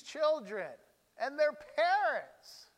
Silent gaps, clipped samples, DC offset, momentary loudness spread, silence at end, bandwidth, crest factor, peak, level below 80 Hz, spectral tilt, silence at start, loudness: none; under 0.1%; under 0.1%; 16 LU; 0.15 s; 13.5 kHz; 16 dB; -20 dBFS; -82 dBFS; -2.5 dB/octave; 0.05 s; -33 LUFS